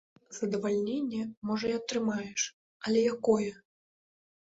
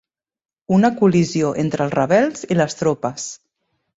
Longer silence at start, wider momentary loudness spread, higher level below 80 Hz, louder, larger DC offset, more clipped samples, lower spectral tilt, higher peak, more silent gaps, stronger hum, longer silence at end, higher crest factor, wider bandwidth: second, 0.3 s vs 0.7 s; about the same, 9 LU vs 9 LU; second, -70 dBFS vs -56 dBFS; second, -31 LUFS vs -18 LUFS; neither; neither; second, -4 dB/octave vs -6 dB/octave; second, -12 dBFS vs -2 dBFS; first, 1.37-1.42 s, 2.53-2.80 s vs none; neither; first, 1 s vs 0.65 s; about the same, 20 dB vs 18 dB; about the same, 8 kHz vs 8 kHz